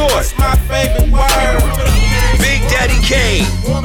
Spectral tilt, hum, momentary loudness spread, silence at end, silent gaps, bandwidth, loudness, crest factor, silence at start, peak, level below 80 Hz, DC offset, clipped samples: -4 dB/octave; none; 2 LU; 0 s; none; 18.5 kHz; -13 LUFS; 8 dB; 0 s; -2 dBFS; -14 dBFS; under 0.1%; under 0.1%